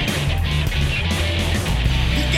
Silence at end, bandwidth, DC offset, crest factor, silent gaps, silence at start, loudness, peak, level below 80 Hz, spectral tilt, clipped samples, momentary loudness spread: 0 s; 16 kHz; under 0.1%; 14 dB; none; 0 s; -20 LUFS; -4 dBFS; -24 dBFS; -4.5 dB/octave; under 0.1%; 1 LU